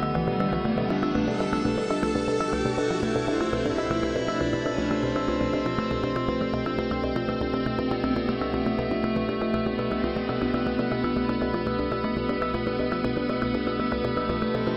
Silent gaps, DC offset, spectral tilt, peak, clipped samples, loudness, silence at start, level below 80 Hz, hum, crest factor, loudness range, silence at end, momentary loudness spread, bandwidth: none; under 0.1%; -6.5 dB/octave; -10 dBFS; under 0.1%; -26 LUFS; 0 s; -40 dBFS; none; 16 dB; 1 LU; 0 s; 2 LU; 9.8 kHz